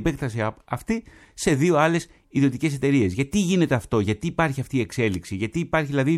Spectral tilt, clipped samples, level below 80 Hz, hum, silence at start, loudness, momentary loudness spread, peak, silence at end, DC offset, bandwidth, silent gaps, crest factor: -6 dB/octave; under 0.1%; -46 dBFS; none; 0 s; -23 LUFS; 8 LU; -4 dBFS; 0 s; under 0.1%; 14 kHz; none; 18 dB